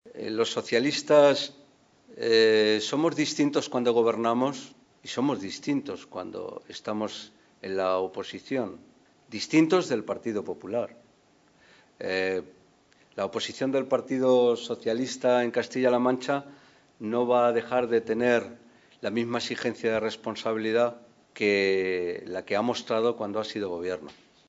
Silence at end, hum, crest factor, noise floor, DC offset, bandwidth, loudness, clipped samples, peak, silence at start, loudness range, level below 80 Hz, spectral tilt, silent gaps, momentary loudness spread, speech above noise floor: 0.35 s; none; 20 dB; -62 dBFS; under 0.1%; 8 kHz; -27 LUFS; under 0.1%; -8 dBFS; 0.05 s; 9 LU; -74 dBFS; -4.5 dB/octave; none; 14 LU; 36 dB